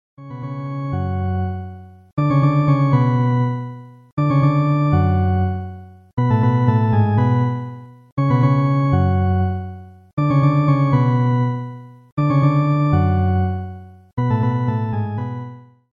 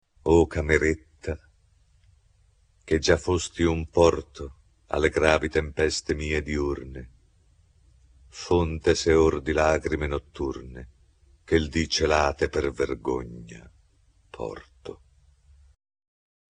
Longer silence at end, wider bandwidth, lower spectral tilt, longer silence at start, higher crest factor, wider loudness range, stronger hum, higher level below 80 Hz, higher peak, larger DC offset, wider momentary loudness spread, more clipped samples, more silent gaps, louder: second, 0.35 s vs 1.6 s; second, 5 kHz vs 10 kHz; first, -10 dB/octave vs -5 dB/octave; about the same, 0.2 s vs 0.25 s; second, 14 dB vs 24 dB; second, 2 LU vs 6 LU; neither; about the same, -44 dBFS vs -40 dBFS; about the same, -2 dBFS vs -2 dBFS; first, 0.1% vs under 0.1%; second, 16 LU vs 20 LU; neither; first, 2.13-2.17 s, 4.12-4.17 s, 6.13-6.17 s, 8.12-8.17 s, 10.13-10.17 s, 12.12-12.17 s vs none; first, -18 LUFS vs -25 LUFS